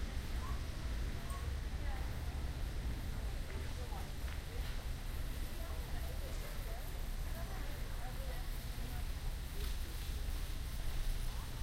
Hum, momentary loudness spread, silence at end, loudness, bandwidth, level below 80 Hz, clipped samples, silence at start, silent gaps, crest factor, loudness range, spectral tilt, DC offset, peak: none; 2 LU; 0 s; -45 LUFS; 16 kHz; -42 dBFS; under 0.1%; 0 s; none; 12 dB; 2 LU; -4.5 dB/octave; under 0.1%; -28 dBFS